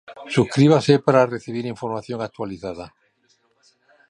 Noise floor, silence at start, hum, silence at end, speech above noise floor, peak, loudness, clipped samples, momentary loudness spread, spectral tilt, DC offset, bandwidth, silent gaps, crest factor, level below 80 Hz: -64 dBFS; 0.1 s; none; 1.2 s; 44 dB; -2 dBFS; -20 LUFS; under 0.1%; 16 LU; -7 dB/octave; under 0.1%; 10.5 kHz; none; 20 dB; -58 dBFS